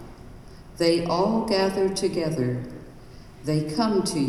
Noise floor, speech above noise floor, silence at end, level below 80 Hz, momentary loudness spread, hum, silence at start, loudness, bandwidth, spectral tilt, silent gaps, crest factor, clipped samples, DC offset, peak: -44 dBFS; 21 dB; 0 s; -48 dBFS; 16 LU; none; 0 s; -24 LUFS; 14.5 kHz; -5.5 dB/octave; none; 18 dB; under 0.1%; under 0.1%; -8 dBFS